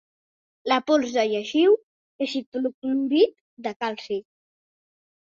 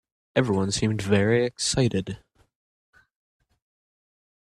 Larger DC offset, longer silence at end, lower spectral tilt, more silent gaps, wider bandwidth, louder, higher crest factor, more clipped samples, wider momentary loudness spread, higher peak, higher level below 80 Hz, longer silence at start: neither; second, 1.1 s vs 2.25 s; about the same, -4 dB/octave vs -5 dB/octave; first, 1.83-2.19 s, 2.46-2.52 s, 2.74-2.82 s, 3.41-3.57 s, 3.76-3.80 s vs none; second, 7.6 kHz vs 12.5 kHz; about the same, -24 LUFS vs -24 LUFS; about the same, 18 dB vs 20 dB; neither; first, 12 LU vs 9 LU; about the same, -6 dBFS vs -6 dBFS; second, -72 dBFS vs -52 dBFS; first, 0.65 s vs 0.35 s